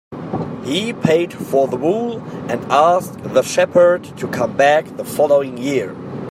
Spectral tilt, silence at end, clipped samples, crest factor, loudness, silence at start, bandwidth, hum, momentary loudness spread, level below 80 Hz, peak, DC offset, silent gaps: -5 dB/octave; 0 s; under 0.1%; 16 dB; -17 LUFS; 0.1 s; 15 kHz; none; 12 LU; -58 dBFS; -2 dBFS; under 0.1%; none